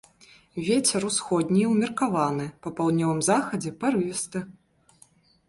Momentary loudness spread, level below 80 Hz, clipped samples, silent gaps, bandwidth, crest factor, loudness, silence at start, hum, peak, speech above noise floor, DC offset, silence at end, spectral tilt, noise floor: 10 LU; -62 dBFS; under 0.1%; none; 11.5 kHz; 16 dB; -25 LUFS; 0.55 s; none; -10 dBFS; 34 dB; under 0.1%; 0.95 s; -4.5 dB/octave; -59 dBFS